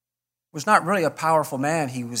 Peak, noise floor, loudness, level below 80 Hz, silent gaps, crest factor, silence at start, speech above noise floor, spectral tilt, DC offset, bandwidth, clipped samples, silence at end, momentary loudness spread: -2 dBFS; -89 dBFS; -22 LUFS; -72 dBFS; none; 22 dB; 0.55 s; 67 dB; -4.5 dB/octave; under 0.1%; 16 kHz; under 0.1%; 0 s; 9 LU